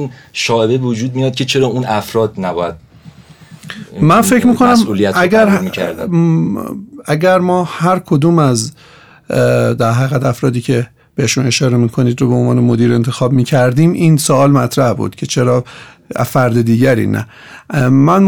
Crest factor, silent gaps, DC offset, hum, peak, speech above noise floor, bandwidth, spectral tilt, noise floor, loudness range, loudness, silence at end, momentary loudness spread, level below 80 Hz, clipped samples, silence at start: 10 dB; none; 0.2%; none; -2 dBFS; 26 dB; 19.5 kHz; -6 dB/octave; -38 dBFS; 3 LU; -13 LUFS; 0 s; 10 LU; -46 dBFS; under 0.1%; 0 s